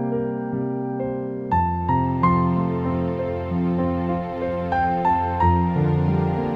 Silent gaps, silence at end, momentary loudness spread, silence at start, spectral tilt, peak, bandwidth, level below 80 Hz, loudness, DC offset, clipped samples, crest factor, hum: none; 0 s; 7 LU; 0 s; -10.5 dB/octave; -6 dBFS; 5.2 kHz; -40 dBFS; -22 LUFS; under 0.1%; under 0.1%; 16 dB; none